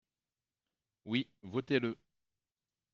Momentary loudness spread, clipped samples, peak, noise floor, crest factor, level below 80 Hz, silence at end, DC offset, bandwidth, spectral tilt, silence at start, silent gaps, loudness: 15 LU; under 0.1%; -18 dBFS; under -90 dBFS; 22 dB; -80 dBFS; 1 s; under 0.1%; 7 kHz; -4.5 dB/octave; 1.05 s; none; -36 LUFS